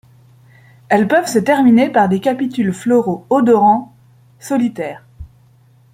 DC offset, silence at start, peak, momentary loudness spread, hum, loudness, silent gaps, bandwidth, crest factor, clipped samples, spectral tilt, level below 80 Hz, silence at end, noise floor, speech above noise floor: under 0.1%; 0.9 s; -2 dBFS; 10 LU; none; -14 LUFS; none; 15.5 kHz; 14 dB; under 0.1%; -6 dB/octave; -50 dBFS; 0.7 s; -49 dBFS; 36 dB